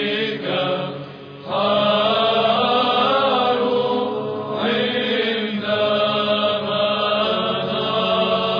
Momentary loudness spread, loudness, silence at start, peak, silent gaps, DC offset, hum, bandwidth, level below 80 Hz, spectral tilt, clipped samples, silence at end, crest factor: 7 LU; -19 LUFS; 0 s; -6 dBFS; none; under 0.1%; none; 5.2 kHz; -60 dBFS; -6.5 dB/octave; under 0.1%; 0 s; 14 dB